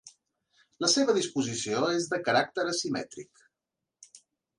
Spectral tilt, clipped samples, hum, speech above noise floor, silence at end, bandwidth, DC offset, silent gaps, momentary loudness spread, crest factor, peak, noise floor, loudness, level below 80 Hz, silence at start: -3 dB/octave; under 0.1%; none; 59 dB; 0.4 s; 11.5 kHz; under 0.1%; none; 10 LU; 20 dB; -12 dBFS; -88 dBFS; -28 LUFS; -74 dBFS; 0.05 s